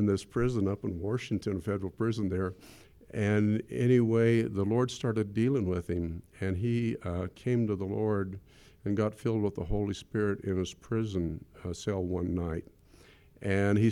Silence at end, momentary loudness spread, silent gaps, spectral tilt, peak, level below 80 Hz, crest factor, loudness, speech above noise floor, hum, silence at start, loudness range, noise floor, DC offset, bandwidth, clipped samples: 0 s; 10 LU; none; -7.5 dB/octave; -14 dBFS; -50 dBFS; 16 dB; -31 LUFS; 28 dB; none; 0 s; 5 LU; -58 dBFS; under 0.1%; 12 kHz; under 0.1%